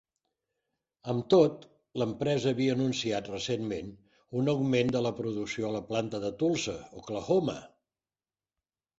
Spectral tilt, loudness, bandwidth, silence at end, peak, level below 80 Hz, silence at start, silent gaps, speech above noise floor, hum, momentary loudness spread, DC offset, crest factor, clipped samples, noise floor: -6 dB/octave; -30 LUFS; 8 kHz; 1.35 s; -10 dBFS; -64 dBFS; 1.05 s; none; over 61 dB; none; 13 LU; under 0.1%; 22 dB; under 0.1%; under -90 dBFS